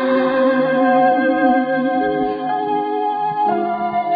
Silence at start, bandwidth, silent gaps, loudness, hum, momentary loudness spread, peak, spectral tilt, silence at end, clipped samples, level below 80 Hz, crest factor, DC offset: 0 s; 5 kHz; none; -17 LUFS; none; 6 LU; -2 dBFS; -9 dB/octave; 0 s; under 0.1%; -58 dBFS; 14 dB; under 0.1%